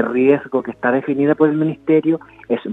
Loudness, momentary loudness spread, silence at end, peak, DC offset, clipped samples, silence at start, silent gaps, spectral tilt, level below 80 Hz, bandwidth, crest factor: -17 LUFS; 8 LU; 0 s; 0 dBFS; under 0.1%; under 0.1%; 0 s; none; -9.5 dB/octave; -60 dBFS; 3.9 kHz; 16 dB